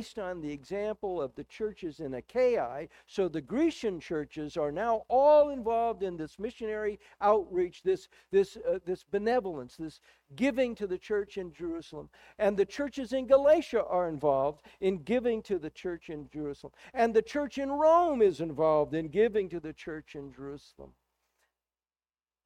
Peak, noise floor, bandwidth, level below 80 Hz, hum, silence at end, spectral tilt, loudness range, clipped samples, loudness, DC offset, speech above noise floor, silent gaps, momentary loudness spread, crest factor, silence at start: -12 dBFS; under -90 dBFS; 11.5 kHz; -60 dBFS; none; 1.55 s; -6.5 dB/octave; 5 LU; under 0.1%; -30 LUFS; under 0.1%; over 60 dB; none; 16 LU; 20 dB; 0 s